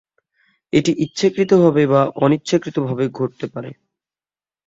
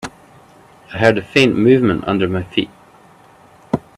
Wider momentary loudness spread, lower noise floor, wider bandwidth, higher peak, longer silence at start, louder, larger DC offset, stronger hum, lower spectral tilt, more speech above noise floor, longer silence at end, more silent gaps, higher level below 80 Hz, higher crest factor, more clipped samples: about the same, 14 LU vs 16 LU; first, under -90 dBFS vs -46 dBFS; second, 8 kHz vs 12.5 kHz; about the same, -2 dBFS vs 0 dBFS; first, 0.75 s vs 0.05 s; about the same, -17 LUFS vs -15 LUFS; neither; neither; about the same, -6.5 dB/octave vs -6 dB/octave; first, over 73 dB vs 32 dB; first, 0.95 s vs 0.2 s; neither; second, -58 dBFS vs -50 dBFS; about the same, 16 dB vs 18 dB; neither